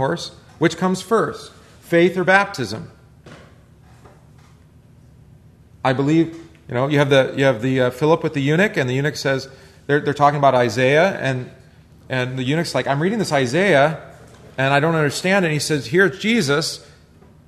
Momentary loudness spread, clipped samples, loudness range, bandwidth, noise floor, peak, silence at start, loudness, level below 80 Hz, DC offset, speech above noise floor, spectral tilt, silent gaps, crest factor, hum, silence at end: 12 LU; under 0.1%; 6 LU; 13.5 kHz; -48 dBFS; 0 dBFS; 0 s; -18 LUFS; -54 dBFS; under 0.1%; 30 dB; -5.5 dB/octave; none; 18 dB; none; 0.7 s